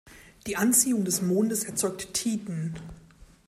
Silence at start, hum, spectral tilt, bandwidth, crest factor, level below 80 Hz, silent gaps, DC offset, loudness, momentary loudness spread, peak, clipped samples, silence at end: 0.05 s; none; -4 dB/octave; 16 kHz; 20 dB; -58 dBFS; none; under 0.1%; -26 LUFS; 16 LU; -8 dBFS; under 0.1%; 0.25 s